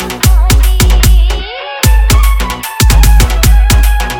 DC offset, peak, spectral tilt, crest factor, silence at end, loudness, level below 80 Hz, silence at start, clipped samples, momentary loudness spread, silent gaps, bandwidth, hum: under 0.1%; 0 dBFS; -4 dB/octave; 6 dB; 0 s; -9 LUFS; -8 dBFS; 0 s; 0.6%; 7 LU; none; 17.5 kHz; none